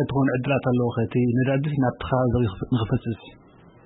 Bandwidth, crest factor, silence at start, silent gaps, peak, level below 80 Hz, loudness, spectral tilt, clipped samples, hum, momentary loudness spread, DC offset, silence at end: 4 kHz; 14 dB; 0 s; none; -8 dBFS; -46 dBFS; -23 LUFS; -12.5 dB/octave; under 0.1%; none; 5 LU; under 0.1%; 0.55 s